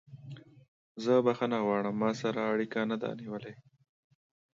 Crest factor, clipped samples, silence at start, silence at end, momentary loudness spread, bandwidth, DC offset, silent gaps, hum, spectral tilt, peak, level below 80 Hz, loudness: 18 dB; under 0.1%; 0.1 s; 1.05 s; 22 LU; 7.6 kHz; under 0.1%; 0.68-0.95 s; none; -6.5 dB/octave; -14 dBFS; -78 dBFS; -31 LUFS